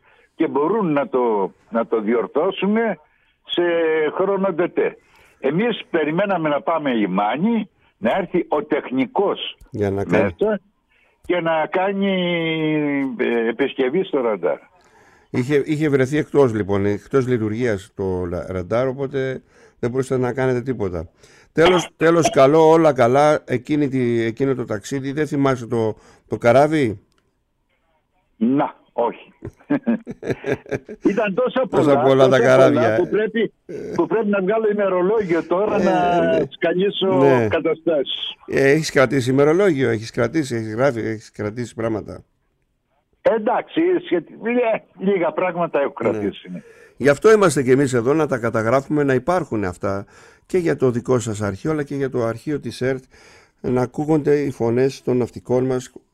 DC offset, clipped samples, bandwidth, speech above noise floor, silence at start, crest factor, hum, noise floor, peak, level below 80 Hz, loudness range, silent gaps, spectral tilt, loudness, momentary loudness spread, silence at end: under 0.1%; under 0.1%; 13 kHz; 49 dB; 0.4 s; 18 dB; none; -67 dBFS; -2 dBFS; -54 dBFS; 6 LU; none; -6 dB/octave; -19 LUFS; 10 LU; 0.25 s